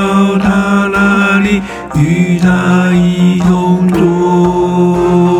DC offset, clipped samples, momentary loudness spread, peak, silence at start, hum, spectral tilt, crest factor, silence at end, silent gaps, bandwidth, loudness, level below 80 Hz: under 0.1%; under 0.1%; 2 LU; 0 dBFS; 0 s; none; -7 dB/octave; 10 dB; 0 s; none; 11 kHz; -10 LUFS; -34 dBFS